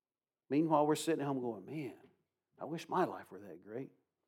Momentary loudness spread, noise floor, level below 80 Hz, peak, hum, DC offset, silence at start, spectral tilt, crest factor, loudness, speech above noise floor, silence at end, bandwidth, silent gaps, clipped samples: 18 LU; under -90 dBFS; under -90 dBFS; -16 dBFS; none; under 0.1%; 0.5 s; -6 dB/octave; 22 dB; -36 LUFS; over 54 dB; 0.4 s; 17 kHz; none; under 0.1%